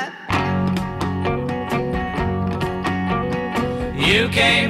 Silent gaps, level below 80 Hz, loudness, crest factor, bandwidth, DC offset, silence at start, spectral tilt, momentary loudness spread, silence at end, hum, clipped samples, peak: none; -36 dBFS; -21 LUFS; 16 dB; 14.5 kHz; under 0.1%; 0 s; -5.5 dB/octave; 8 LU; 0 s; none; under 0.1%; -4 dBFS